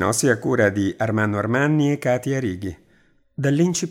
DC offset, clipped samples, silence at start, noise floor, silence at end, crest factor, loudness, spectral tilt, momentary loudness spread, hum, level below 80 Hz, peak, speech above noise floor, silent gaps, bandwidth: under 0.1%; under 0.1%; 0 s; -58 dBFS; 0 s; 16 dB; -21 LUFS; -5.5 dB/octave; 8 LU; none; -58 dBFS; -4 dBFS; 38 dB; none; 16.5 kHz